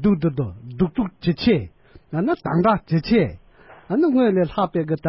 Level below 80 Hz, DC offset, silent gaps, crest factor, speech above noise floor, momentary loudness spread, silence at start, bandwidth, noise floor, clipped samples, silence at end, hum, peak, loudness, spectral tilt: -44 dBFS; under 0.1%; none; 16 dB; 28 dB; 8 LU; 0 s; 5.8 kHz; -47 dBFS; under 0.1%; 0 s; none; -6 dBFS; -21 LUFS; -12 dB/octave